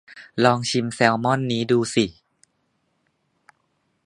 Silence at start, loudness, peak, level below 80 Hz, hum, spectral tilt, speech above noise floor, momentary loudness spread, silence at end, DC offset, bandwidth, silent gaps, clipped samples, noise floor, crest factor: 0.1 s; -21 LUFS; 0 dBFS; -60 dBFS; none; -5 dB/octave; 50 dB; 5 LU; 1.95 s; under 0.1%; 11 kHz; none; under 0.1%; -70 dBFS; 24 dB